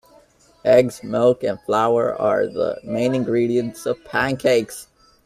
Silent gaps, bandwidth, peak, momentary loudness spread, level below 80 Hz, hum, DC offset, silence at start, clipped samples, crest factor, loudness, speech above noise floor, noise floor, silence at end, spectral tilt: none; 15 kHz; -2 dBFS; 9 LU; -56 dBFS; none; under 0.1%; 0.65 s; under 0.1%; 18 dB; -20 LUFS; 34 dB; -53 dBFS; 0.4 s; -6 dB/octave